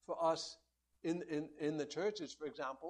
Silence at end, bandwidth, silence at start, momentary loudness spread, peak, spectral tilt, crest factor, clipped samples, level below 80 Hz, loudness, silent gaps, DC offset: 0 s; 11 kHz; 0.1 s; 9 LU; -24 dBFS; -4.5 dB/octave; 18 dB; under 0.1%; -80 dBFS; -41 LUFS; none; under 0.1%